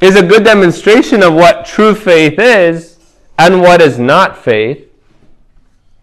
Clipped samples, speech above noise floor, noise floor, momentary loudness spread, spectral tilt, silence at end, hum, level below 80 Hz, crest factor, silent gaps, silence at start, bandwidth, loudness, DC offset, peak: 4%; 38 dB; -45 dBFS; 8 LU; -5.5 dB/octave; 1.25 s; none; -42 dBFS; 8 dB; none; 0 s; 16 kHz; -7 LUFS; under 0.1%; 0 dBFS